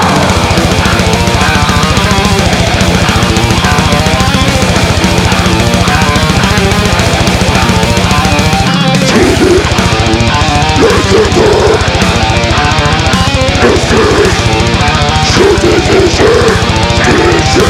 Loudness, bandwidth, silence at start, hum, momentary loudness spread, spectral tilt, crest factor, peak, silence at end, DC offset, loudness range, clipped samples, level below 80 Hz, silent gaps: -8 LUFS; 16.5 kHz; 0 s; none; 2 LU; -4.5 dB/octave; 8 dB; 0 dBFS; 0 s; under 0.1%; 1 LU; under 0.1%; -18 dBFS; none